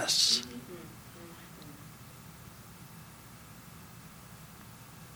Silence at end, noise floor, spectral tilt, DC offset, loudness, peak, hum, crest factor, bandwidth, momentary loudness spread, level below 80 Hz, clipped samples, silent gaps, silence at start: 0 s; -51 dBFS; -1 dB/octave; under 0.1%; -28 LUFS; -14 dBFS; none; 26 dB; over 20 kHz; 23 LU; -64 dBFS; under 0.1%; none; 0 s